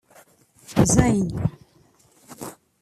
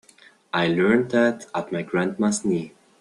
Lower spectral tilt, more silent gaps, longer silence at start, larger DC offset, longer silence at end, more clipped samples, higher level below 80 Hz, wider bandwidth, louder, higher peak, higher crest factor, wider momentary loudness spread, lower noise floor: about the same, -5.5 dB/octave vs -5 dB/octave; neither; first, 0.7 s vs 0.55 s; neither; about the same, 0.3 s vs 0.3 s; neither; first, -40 dBFS vs -62 dBFS; first, 14.5 kHz vs 11.5 kHz; about the same, -21 LUFS vs -23 LUFS; first, -2 dBFS vs -6 dBFS; about the same, 22 dB vs 18 dB; first, 21 LU vs 9 LU; first, -58 dBFS vs -54 dBFS